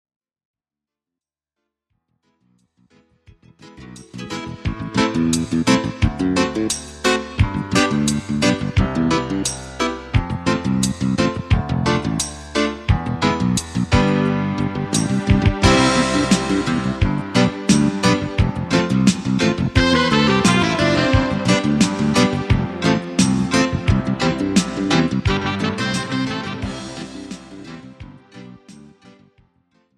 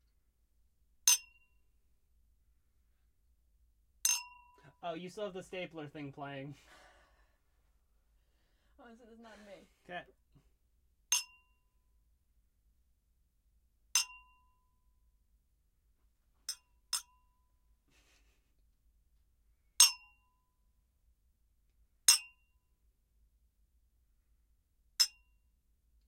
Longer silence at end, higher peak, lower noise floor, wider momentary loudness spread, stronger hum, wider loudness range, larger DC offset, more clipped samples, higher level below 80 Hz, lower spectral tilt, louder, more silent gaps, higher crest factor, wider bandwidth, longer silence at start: about the same, 0.9 s vs 1 s; first, 0 dBFS vs -8 dBFS; first, -88 dBFS vs -75 dBFS; second, 11 LU vs 22 LU; neither; second, 9 LU vs 15 LU; neither; neither; first, -32 dBFS vs -72 dBFS; first, -5 dB/octave vs 0.5 dB/octave; first, -18 LUFS vs -31 LUFS; neither; second, 20 dB vs 34 dB; second, 13.5 kHz vs 16 kHz; first, 3.65 s vs 1.05 s